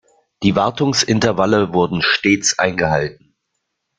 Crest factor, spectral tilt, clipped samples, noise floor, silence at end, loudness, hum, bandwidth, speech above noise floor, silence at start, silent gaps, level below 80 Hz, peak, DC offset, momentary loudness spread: 16 dB; -4 dB/octave; under 0.1%; -74 dBFS; 0.85 s; -16 LUFS; none; 9.6 kHz; 58 dB; 0.4 s; none; -48 dBFS; 0 dBFS; under 0.1%; 4 LU